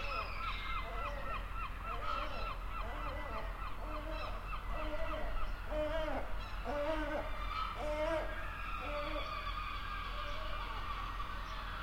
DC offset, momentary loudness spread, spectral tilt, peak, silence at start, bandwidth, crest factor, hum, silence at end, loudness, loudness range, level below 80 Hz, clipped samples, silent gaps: under 0.1%; 6 LU; -5.5 dB/octave; -24 dBFS; 0 s; 16.5 kHz; 16 dB; none; 0 s; -41 LUFS; 3 LU; -44 dBFS; under 0.1%; none